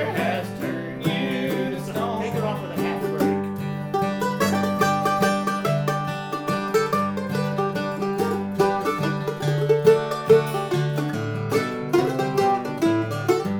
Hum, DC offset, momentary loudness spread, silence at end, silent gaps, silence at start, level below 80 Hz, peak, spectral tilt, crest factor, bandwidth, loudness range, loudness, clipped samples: none; under 0.1%; 8 LU; 0 s; none; 0 s; -58 dBFS; -4 dBFS; -6 dB/octave; 20 dB; over 20 kHz; 4 LU; -23 LUFS; under 0.1%